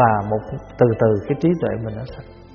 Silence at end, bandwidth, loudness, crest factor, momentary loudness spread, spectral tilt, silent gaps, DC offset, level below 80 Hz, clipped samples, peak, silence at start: 0 s; 6.6 kHz; -20 LUFS; 18 dB; 16 LU; -8 dB/octave; none; under 0.1%; -44 dBFS; under 0.1%; 0 dBFS; 0 s